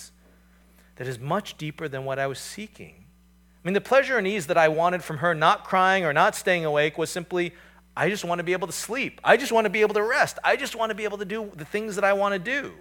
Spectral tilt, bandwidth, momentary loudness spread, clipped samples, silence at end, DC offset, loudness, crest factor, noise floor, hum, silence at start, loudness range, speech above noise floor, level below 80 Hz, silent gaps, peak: -4 dB/octave; 19 kHz; 13 LU; under 0.1%; 0.05 s; under 0.1%; -24 LUFS; 22 dB; -57 dBFS; none; 0 s; 7 LU; 33 dB; -60 dBFS; none; -2 dBFS